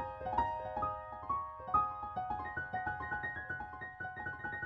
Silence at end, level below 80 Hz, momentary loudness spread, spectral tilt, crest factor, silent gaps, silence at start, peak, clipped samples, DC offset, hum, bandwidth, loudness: 0 s; -58 dBFS; 9 LU; -7.5 dB/octave; 20 dB; none; 0 s; -20 dBFS; under 0.1%; under 0.1%; none; 7.2 kHz; -39 LUFS